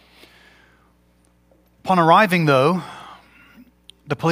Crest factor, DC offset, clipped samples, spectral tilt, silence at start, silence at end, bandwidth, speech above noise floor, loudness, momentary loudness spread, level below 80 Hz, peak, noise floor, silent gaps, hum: 20 dB; under 0.1%; under 0.1%; -6.5 dB/octave; 1.85 s; 0 s; 16 kHz; 43 dB; -17 LUFS; 21 LU; -60 dBFS; 0 dBFS; -58 dBFS; none; 60 Hz at -40 dBFS